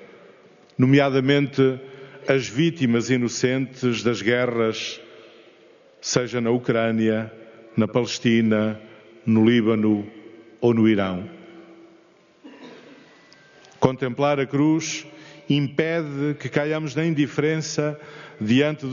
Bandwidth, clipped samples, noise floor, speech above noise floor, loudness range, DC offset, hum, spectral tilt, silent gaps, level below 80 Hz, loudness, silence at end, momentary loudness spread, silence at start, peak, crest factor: 7.4 kHz; under 0.1%; -55 dBFS; 34 dB; 5 LU; under 0.1%; none; -5.5 dB/octave; none; -64 dBFS; -22 LUFS; 0 s; 13 LU; 0 s; 0 dBFS; 22 dB